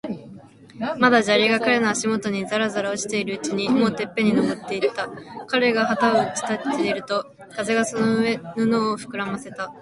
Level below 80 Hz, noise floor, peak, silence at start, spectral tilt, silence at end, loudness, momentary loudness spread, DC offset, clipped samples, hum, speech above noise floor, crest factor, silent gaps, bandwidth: -62 dBFS; -44 dBFS; 0 dBFS; 0.05 s; -4 dB/octave; 0 s; -22 LUFS; 12 LU; under 0.1%; under 0.1%; none; 22 dB; 22 dB; none; 11.5 kHz